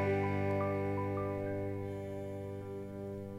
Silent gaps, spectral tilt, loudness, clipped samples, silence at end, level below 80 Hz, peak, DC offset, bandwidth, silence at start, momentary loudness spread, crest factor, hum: none; -8.5 dB/octave; -38 LUFS; under 0.1%; 0 s; -64 dBFS; -24 dBFS; under 0.1%; 12 kHz; 0 s; 10 LU; 14 dB; 50 Hz at -60 dBFS